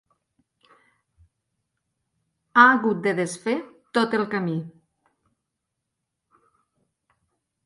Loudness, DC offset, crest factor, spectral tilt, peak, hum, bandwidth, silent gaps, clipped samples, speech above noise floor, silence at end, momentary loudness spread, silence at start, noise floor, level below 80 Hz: -22 LUFS; under 0.1%; 26 dB; -5 dB/octave; 0 dBFS; none; 11.5 kHz; none; under 0.1%; 60 dB; 2.95 s; 14 LU; 2.55 s; -82 dBFS; -72 dBFS